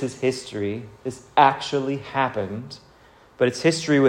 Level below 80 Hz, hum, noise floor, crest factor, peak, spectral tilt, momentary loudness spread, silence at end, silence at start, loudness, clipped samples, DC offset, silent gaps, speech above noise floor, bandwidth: -60 dBFS; none; -52 dBFS; 20 dB; -2 dBFS; -5 dB/octave; 16 LU; 0 s; 0 s; -23 LUFS; under 0.1%; under 0.1%; none; 30 dB; 15 kHz